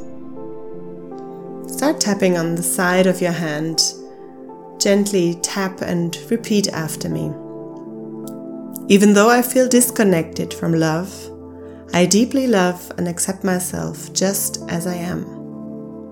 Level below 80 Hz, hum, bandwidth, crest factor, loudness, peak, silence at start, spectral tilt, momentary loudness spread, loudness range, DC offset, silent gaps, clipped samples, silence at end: -60 dBFS; none; 18 kHz; 20 dB; -18 LUFS; 0 dBFS; 0 s; -4.5 dB/octave; 20 LU; 6 LU; under 0.1%; none; under 0.1%; 0 s